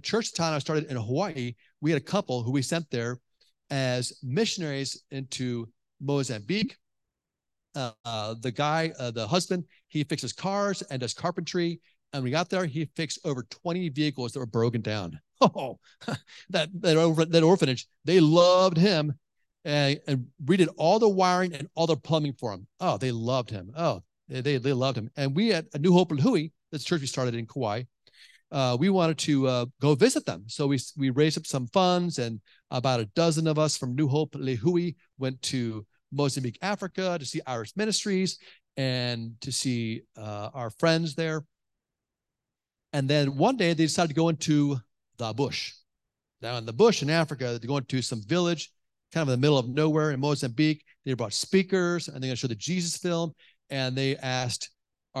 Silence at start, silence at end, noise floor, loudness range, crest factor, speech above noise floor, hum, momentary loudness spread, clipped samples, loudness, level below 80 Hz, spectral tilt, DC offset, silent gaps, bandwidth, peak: 0.05 s; 0 s; -88 dBFS; 7 LU; 22 dB; 62 dB; none; 13 LU; under 0.1%; -27 LUFS; -66 dBFS; -5.5 dB/octave; under 0.1%; 8.00-8.04 s; 12.5 kHz; -6 dBFS